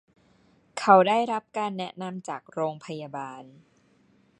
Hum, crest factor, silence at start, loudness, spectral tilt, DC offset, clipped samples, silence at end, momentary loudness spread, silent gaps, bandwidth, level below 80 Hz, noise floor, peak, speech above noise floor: none; 24 dB; 0.75 s; -25 LUFS; -5.5 dB/octave; under 0.1%; under 0.1%; 0.95 s; 19 LU; none; 11 kHz; -76 dBFS; -63 dBFS; -2 dBFS; 37 dB